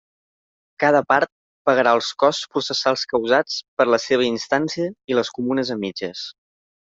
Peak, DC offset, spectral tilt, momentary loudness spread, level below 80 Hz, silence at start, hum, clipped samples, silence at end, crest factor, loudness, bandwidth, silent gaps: -2 dBFS; under 0.1%; -4 dB/octave; 10 LU; -66 dBFS; 0.8 s; none; under 0.1%; 0.5 s; 18 dB; -20 LUFS; 7.8 kHz; 1.32-1.65 s, 3.68-3.77 s